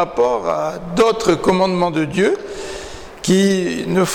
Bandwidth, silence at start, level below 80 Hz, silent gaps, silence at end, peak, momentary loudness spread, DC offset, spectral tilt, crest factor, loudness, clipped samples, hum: 17.5 kHz; 0 s; -44 dBFS; none; 0 s; -6 dBFS; 14 LU; under 0.1%; -5 dB/octave; 12 dB; -17 LUFS; under 0.1%; none